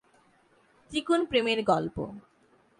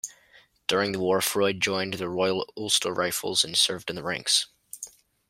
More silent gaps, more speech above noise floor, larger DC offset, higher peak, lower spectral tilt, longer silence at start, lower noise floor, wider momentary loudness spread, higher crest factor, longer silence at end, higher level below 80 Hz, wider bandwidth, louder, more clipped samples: neither; first, 36 dB vs 32 dB; neither; second, -12 dBFS vs -8 dBFS; first, -5 dB/octave vs -2 dB/octave; first, 0.9 s vs 0.05 s; first, -64 dBFS vs -58 dBFS; about the same, 14 LU vs 15 LU; about the same, 20 dB vs 20 dB; first, 0.6 s vs 0.4 s; first, -60 dBFS vs -66 dBFS; second, 11 kHz vs 16 kHz; second, -28 LUFS vs -25 LUFS; neither